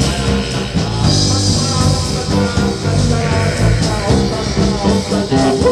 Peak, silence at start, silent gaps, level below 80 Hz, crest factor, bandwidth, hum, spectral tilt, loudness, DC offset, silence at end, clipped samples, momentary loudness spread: -2 dBFS; 0 s; none; -24 dBFS; 12 dB; 13.5 kHz; none; -5 dB/octave; -15 LUFS; under 0.1%; 0 s; under 0.1%; 4 LU